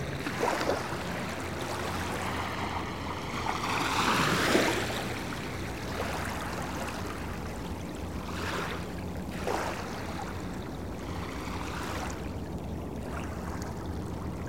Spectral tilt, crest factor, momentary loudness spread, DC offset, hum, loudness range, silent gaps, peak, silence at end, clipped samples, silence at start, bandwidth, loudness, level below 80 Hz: -4.5 dB/octave; 22 dB; 11 LU; 0.3%; none; 7 LU; none; -10 dBFS; 0 s; under 0.1%; 0 s; 16.5 kHz; -33 LUFS; -46 dBFS